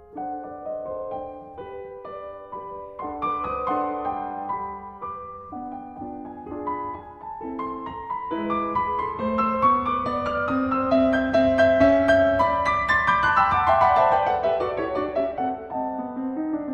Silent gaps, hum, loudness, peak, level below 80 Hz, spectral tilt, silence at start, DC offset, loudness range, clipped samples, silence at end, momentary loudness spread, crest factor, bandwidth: none; none; -23 LUFS; -6 dBFS; -50 dBFS; -6.5 dB/octave; 0 s; under 0.1%; 14 LU; under 0.1%; 0 s; 18 LU; 18 dB; 9 kHz